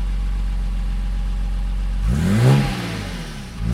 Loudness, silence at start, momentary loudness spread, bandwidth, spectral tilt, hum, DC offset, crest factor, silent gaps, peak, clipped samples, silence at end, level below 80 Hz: -22 LUFS; 0 s; 12 LU; 13 kHz; -6.5 dB/octave; none; under 0.1%; 18 dB; none; -2 dBFS; under 0.1%; 0 s; -22 dBFS